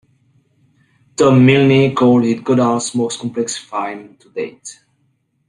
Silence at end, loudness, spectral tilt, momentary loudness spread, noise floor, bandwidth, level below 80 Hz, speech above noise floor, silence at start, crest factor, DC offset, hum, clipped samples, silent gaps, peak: 0.75 s; -14 LUFS; -6 dB/octave; 21 LU; -63 dBFS; 11 kHz; -54 dBFS; 49 dB; 1.2 s; 16 dB; under 0.1%; none; under 0.1%; none; 0 dBFS